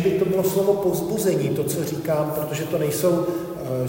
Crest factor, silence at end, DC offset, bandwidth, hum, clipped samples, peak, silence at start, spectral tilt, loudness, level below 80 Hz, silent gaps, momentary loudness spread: 14 dB; 0 s; under 0.1%; 16.5 kHz; none; under 0.1%; -8 dBFS; 0 s; -6 dB/octave; -23 LUFS; -54 dBFS; none; 6 LU